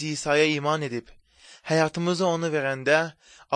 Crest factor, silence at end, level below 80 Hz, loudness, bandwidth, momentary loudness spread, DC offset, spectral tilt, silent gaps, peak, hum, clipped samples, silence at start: 18 dB; 0 s; -62 dBFS; -24 LUFS; 9.8 kHz; 11 LU; under 0.1%; -4.5 dB/octave; none; -6 dBFS; none; under 0.1%; 0 s